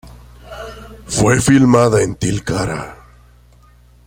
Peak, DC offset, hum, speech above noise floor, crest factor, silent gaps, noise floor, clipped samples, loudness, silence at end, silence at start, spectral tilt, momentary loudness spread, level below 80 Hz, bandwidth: 0 dBFS; under 0.1%; 60 Hz at -30 dBFS; 33 dB; 16 dB; none; -47 dBFS; under 0.1%; -14 LUFS; 1.15 s; 0.05 s; -5.5 dB/octave; 22 LU; -38 dBFS; 16.5 kHz